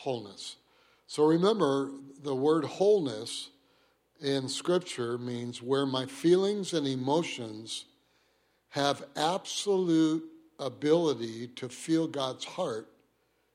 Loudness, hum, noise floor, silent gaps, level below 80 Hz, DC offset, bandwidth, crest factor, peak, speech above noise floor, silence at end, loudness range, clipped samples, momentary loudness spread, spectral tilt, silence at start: -30 LUFS; none; -72 dBFS; none; -78 dBFS; under 0.1%; 14.5 kHz; 18 dB; -12 dBFS; 43 dB; 0.7 s; 3 LU; under 0.1%; 14 LU; -5 dB/octave; 0 s